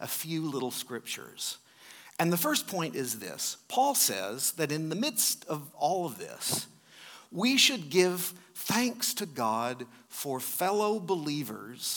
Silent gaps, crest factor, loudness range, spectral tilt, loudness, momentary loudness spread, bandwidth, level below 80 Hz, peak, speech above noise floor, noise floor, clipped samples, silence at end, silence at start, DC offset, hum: none; 24 dB; 4 LU; -2.5 dB/octave; -30 LUFS; 13 LU; 19 kHz; -84 dBFS; -8 dBFS; 22 dB; -53 dBFS; under 0.1%; 0 s; 0 s; under 0.1%; none